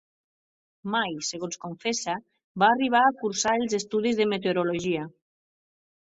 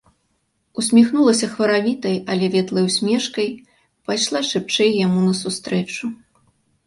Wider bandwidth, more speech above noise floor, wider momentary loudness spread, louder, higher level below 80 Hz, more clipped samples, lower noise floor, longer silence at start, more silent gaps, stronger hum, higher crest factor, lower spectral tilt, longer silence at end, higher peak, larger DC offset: second, 8.2 kHz vs 11.5 kHz; first, over 65 dB vs 50 dB; about the same, 13 LU vs 11 LU; second, -26 LUFS vs -19 LUFS; about the same, -68 dBFS vs -64 dBFS; neither; first, under -90 dBFS vs -68 dBFS; about the same, 0.85 s vs 0.75 s; first, 2.44-2.55 s vs none; neither; about the same, 20 dB vs 16 dB; about the same, -3.5 dB/octave vs -4.5 dB/octave; first, 1.05 s vs 0.7 s; second, -6 dBFS vs -2 dBFS; neither